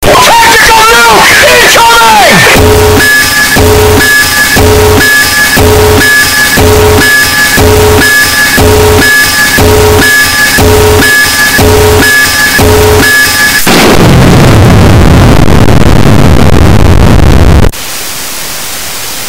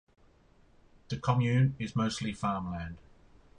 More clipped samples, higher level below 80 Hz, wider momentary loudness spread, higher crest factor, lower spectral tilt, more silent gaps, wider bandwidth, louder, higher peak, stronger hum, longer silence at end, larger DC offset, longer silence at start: first, 10% vs under 0.1%; first, -14 dBFS vs -54 dBFS; second, 4 LU vs 13 LU; second, 2 dB vs 20 dB; second, -3.5 dB/octave vs -6.5 dB/octave; neither; first, over 20 kHz vs 10.5 kHz; first, -2 LUFS vs -31 LUFS; first, 0 dBFS vs -14 dBFS; neither; second, 0 s vs 0.6 s; neither; second, 0 s vs 1.1 s